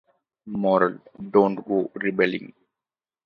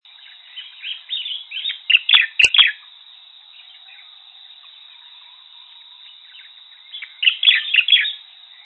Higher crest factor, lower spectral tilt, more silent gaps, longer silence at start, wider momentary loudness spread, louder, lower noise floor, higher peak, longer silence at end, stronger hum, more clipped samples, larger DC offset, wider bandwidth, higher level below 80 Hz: about the same, 22 dB vs 22 dB; first, -9 dB/octave vs 2.5 dB/octave; neither; about the same, 0.45 s vs 0.55 s; second, 13 LU vs 24 LU; second, -23 LUFS vs -14 LUFS; first, under -90 dBFS vs -45 dBFS; second, -4 dBFS vs 0 dBFS; first, 0.8 s vs 0.45 s; neither; neither; neither; second, 5.6 kHz vs 8.8 kHz; about the same, -68 dBFS vs -64 dBFS